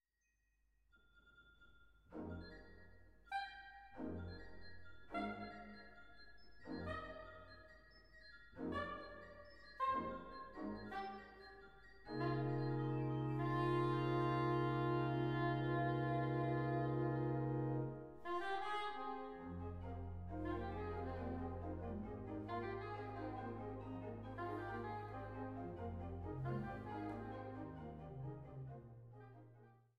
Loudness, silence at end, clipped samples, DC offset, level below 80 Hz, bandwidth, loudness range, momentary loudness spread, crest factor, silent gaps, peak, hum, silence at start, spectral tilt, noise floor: -44 LUFS; 0.2 s; under 0.1%; under 0.1%; -62 dBFS; 5.6 kHz; 13 LU; 20 LU; 18 dB; none; -28 dBFS; none; 0.95 s; -8.5 dB/octave; -84 dBFS